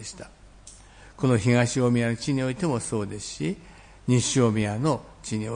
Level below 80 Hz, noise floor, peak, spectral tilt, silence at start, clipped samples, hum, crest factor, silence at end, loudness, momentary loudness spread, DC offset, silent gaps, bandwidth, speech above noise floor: -52 dBFS; -48 dBFS; -8 dBFS; -5.5 dB/octave; 0 s; under 0.1%; none; 18 dB; 0 s; -25 LUFS; 12 LU; under 0.1%; none; 10.5 kHz; 24 dB